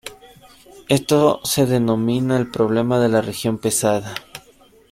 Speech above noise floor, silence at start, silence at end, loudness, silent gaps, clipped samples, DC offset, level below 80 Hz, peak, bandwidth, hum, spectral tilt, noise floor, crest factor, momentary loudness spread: 33 dB; 0.05 s; 0.55 s; -18 LUFS; none; under 0.1%; under 0.1%; -54 dBFS; -2 dBFS; 16.5 kHz; none; -5 dB/octave; -51 dBFS; 18 dB; 15 LU